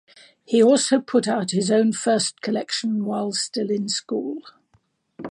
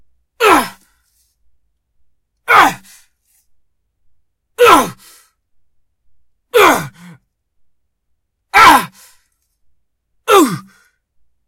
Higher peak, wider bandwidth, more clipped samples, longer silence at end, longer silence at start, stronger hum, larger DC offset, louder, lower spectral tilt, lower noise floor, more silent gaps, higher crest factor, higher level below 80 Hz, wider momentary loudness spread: second, -6 dBFS vs 0 dBFS; second, 11.5 kHz vs over 20 kHz; second, under 0.1% vs 0.3%; second, 0 s vs 0.85 s; about the same, 0.5 s vs 0.4 s; neither; neither; second, -21 LUFS vs -10 LUFS; about the same, -4 dB/octave vs -3 dB/octave; about the same, -64 dBFS vs -66 dBFS; neither; about the same, 16 dB vs 16 dB; second, -74 dBFS vs -48 dBFS; second, 11 LU vs 21 LU